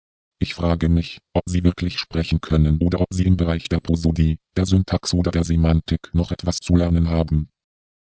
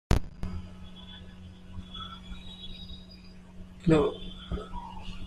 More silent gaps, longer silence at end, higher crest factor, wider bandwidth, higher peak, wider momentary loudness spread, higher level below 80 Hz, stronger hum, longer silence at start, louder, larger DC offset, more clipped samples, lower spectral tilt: neither; first, 0.65 s vs 0 s; about the same, 18 dB vs 22 dB; second, 8 kHz vs 13.5 kHz; first, -2 dBFS vs -10 dBFS; second, 6 LU vs 23 LU; first, -28 dBFS vs -40 dBFS; neither; first, 0.4 s vs 0.1 s; first, -21 LUFS vs -33 LUFS; neither; neither; about the same, -7 dB/octave vs -7 dB/octave